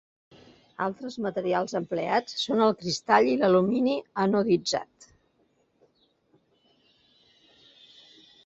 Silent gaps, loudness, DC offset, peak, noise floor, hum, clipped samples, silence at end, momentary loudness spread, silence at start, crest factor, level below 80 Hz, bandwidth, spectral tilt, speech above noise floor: none; -26 LUFS; under 0.1%; -6 dBFS; -69 dBFS; none; under 0.1%; 3.6 s; 10 LU; 0.8 s; 22 dB; -68 dBFS; 8 kHz; -5 dB/octave; 43 dB